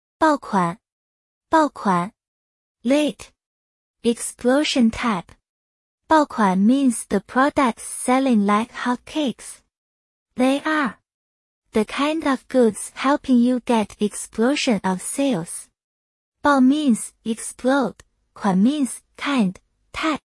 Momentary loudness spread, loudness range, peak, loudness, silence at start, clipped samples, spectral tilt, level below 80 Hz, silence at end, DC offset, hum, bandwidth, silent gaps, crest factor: 9 LU; 4 LU; -6 dBFS; -21 LUFS; 0.2 s; under 0.1%; -5 dB/octave; -56 dBFS; 0.15 s; under 0.1%; none; 12 kHz; 0.92-1.41 s, 2.28-2.75 s, 3.46-3.94 s, 5.49-5.98 s, 9.78-10.26 s, 11.14-11.62 s, 15.84-16.32 s; 16 dB